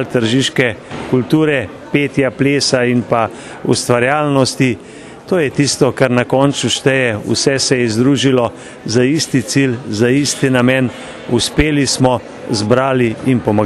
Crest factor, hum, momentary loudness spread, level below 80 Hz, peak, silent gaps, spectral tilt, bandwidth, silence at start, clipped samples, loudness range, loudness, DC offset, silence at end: 14 dB; none; 6 LU; -38 dBFS; 0 dBFS; none; -4.5 dB/octave; 13 kHz; 0 s; under 0.1%; 1 LU; -14 LUFS; under 0.1%; 0 s